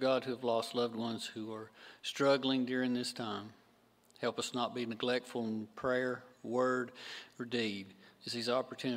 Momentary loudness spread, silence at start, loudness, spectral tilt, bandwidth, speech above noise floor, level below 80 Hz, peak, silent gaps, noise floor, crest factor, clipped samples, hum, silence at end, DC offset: 12 LU; 0 s; -36 LUFS; -4.5 dB/octave; 16 kHz; 32 dB; -78 dBFS; -18 dBFS; none; -68 dBFS; 20 dB; under 0.1%; none; 0 s; under 0.1%